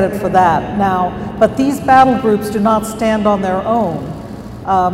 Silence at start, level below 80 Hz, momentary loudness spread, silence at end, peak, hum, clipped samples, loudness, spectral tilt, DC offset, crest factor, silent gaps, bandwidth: 0 s; -38 dBFS; 12 LU; 0 s; 0 dBFS; none; under 0.1%; -14 LUFS; -6.5 dB/octave; under 0.1%; 14 dB; none; 16 kHz